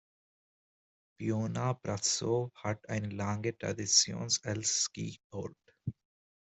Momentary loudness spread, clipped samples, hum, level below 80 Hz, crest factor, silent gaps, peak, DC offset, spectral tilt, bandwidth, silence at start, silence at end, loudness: 17 LU; under 0.1%; none; -68 dBFS; 22 dB; 5.24-5.30 s; -12 dBFS; under 0.1%; -3 dB/octave; 8.4 kHz; 1.2 s; 0.55 s; -32 LUFS